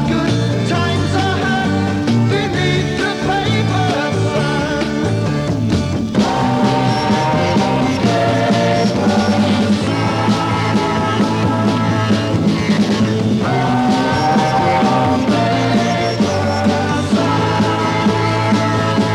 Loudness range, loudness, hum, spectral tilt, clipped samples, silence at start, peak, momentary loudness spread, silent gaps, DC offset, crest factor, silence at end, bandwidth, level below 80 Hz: 2 LU; -15 LUFS; none; -6 dB/octave; under 0.1%; 0 s; -2 dBFS; 3 LU; none; under 0.1%; 12 dB; 0 s; 12.5 kHz; -40 dBFS